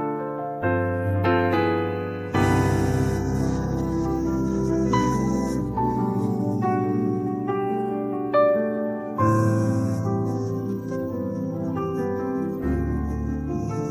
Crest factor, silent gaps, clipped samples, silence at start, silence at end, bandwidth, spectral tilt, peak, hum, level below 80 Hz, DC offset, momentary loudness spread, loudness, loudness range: 16 dB; none; under 0.1%; 0 s; 0 s; 15.5 kHz; -7.5 dB/octave; -8 dBFS; none; -38 dBFS; under 0.1%; 7 LU; -24 LUFS; 4 LU